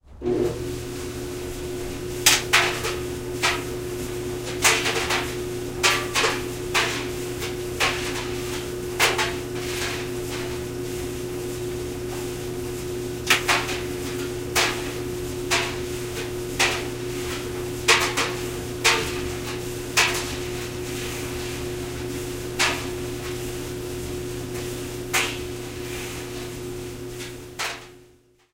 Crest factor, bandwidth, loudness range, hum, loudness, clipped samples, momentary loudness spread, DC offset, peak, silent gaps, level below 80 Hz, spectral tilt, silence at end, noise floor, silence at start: 26 dB; 16 kHz; 7 LU; none; -25 LUFS; under 0.1%; 12 LU; under 0.1%; 0 dBFS; none; -42 dBFS; -3 dB/octave; 0.45 s; -56 dBFS; 0.05 s